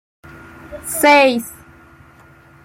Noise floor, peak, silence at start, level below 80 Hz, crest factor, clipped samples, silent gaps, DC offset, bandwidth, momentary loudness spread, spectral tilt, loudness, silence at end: -46 dBFS; -2 dBFS; 0.65 s; -52 dBFS; 18 dB; under 0.1%; none; under 0.1%; 16.5 kHz; 23 LU; -2.5 dB/octave; -13 LUFS; 1.1 s